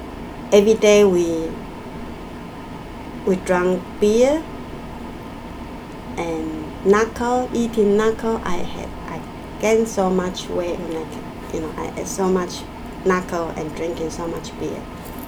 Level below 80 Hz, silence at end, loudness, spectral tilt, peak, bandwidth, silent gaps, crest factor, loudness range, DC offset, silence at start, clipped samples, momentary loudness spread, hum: -40 dBFS; 0 s; -20 LUFS; -5.5 dB/octave; -2 dBFS; over 20 kHz; none; 18 dB; 5 LU; under 0.1%; 0 s; under 0.1%; 18 LU; none